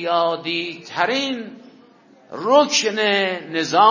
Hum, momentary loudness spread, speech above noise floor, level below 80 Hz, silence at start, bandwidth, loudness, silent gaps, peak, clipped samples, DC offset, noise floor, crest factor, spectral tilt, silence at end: none; 13 LU; 31 dB; -76 dBFS; 0 s; 7.4 kHz; -19 LUFS; none; -2 dBFS; under 0.1%; under 0.1%; -50 dBFS; 18 dB; -2.5 dB/octave; 0 s